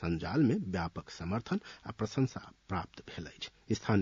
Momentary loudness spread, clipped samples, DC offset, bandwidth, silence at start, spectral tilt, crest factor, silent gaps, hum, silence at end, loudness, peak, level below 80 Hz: 16 LU; under 0.1%; under 0.1%; 7.6 kHz; 0 s; -6.5 dB/octave; 20 dB; none; none; 0 s; -36 LUFS; -16 dBFS; -60 dBFS